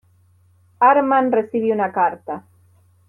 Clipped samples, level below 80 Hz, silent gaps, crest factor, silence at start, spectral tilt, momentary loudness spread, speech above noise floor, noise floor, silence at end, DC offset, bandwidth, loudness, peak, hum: under 0.1%; -70 dBFS; none; 16 dB; 0.8 s; -8.5 dB/octave; 17 LU; 38 dB; -56 dBFS; 0.7 s; under 0.1%; 4 kHz; -17 LUFS; -4 dBFS; none